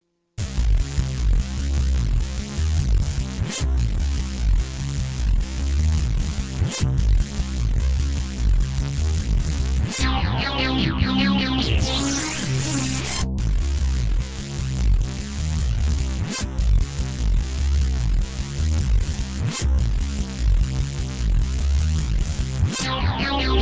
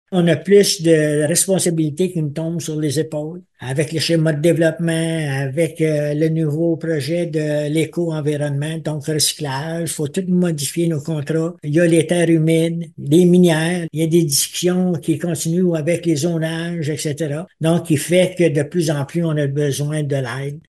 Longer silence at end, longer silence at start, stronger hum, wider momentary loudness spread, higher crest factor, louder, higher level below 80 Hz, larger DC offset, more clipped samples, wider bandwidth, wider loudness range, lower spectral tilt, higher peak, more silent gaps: about the same, 0 s vs 0.1 s; first, 0.4 s vs 0.1 s; neither; second, 5 LU vs 8 LU; about the same, 16 dB vs 16 dB; second, -24 LUFS vs -18 LUFS; first, -22 dBFS vs -60 dBFS; first, 0.3% vs under 0.1%; neither; second, 8 kHz vs 12.5 kHz; about the same, 3 LU vs 4 LU; about the same, -5 dB/octave vs -5.5 dB/octave; second, -6 dBFS vs -2 dBFS; neither